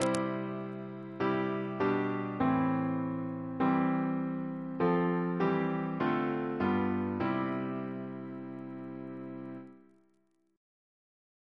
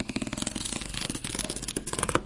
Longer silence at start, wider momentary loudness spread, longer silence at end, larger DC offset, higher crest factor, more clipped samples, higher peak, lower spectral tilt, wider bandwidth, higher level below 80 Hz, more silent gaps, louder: about the same, 0 s vs 0 s; first, 13 LU vs 3 LU; first, 1.75 s vs 0 s; neither; second, 22 dB vs 28 dB; neither; second, -10 dBFS vs -4 dBFS; first, -7.5 dB/octave vs -3 dB/octave; about the same, 11 kHz vs 11.5 kHz; second, -68 dBFS vs -46 dBFS; neither; about the same, -33 LUFS vs -32 LUFS